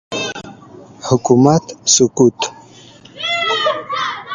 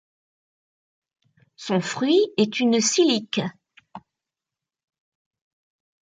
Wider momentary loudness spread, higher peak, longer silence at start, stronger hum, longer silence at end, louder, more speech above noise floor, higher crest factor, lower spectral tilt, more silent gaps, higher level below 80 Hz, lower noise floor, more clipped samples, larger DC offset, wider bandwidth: first, 12 LU vs 9 LU; first, 0 dBFS vs -8 dBFS; second, 0.1 s vs 1.6 s; neither; second, 0 s vs 2.05 s; first, -15 LUFS vs -21 LUFS; second, 28 dB vs 68 dB; about the same, 16 dB vs 18 dB; about the same, -3.5 dB/octave vs -3.5 dB/octave; neither; first, -52 dBFS vs -74 dBFS; second, -41 dBFS vs -89 dBFS; neither; neither; about the same, 10 kHz vs 9.6 kHz